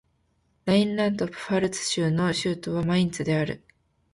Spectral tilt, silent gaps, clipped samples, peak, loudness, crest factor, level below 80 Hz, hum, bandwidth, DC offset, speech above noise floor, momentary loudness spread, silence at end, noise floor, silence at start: -5.5 dB/octave; none; under 0.1%; -8 dBFS; -25 LUFS; 18 dB; -56 dBFS; none; 11.5 kHz; under 0.1%; 44 dB; 7 LU; 0.55 s; -69 dBFS; 0.65 s